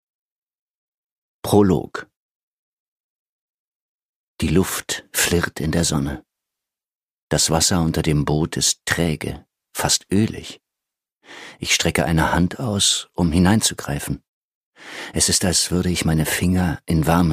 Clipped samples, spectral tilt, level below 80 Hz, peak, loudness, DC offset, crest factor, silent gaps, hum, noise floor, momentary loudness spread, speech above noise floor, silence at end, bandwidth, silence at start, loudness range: under 0.1%; -4 dB/octave; -38 dBFS; 0 dBFS; -19 LUFS; under 0.1%; 20 dB; 2.16-4.37 s, 6.95-7.28 s, 14.28-14.73 s; none; -86 dBFS; 16 LU; 66 dB; 0 s; 15.5 kHz; 1.45 s; 6 LU